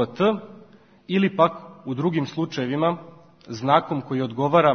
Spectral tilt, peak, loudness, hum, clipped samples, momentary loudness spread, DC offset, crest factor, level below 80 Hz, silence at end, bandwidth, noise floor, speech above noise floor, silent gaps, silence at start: -7 dB/octave; -2 dBFS; -23 LUFS; none; under 0.1%; 12 LU; under 0.1%; 20 dB; -66 dBFS; 0 s; 6.6 kHz; -51 dBFS; 29 dB; none; 0 s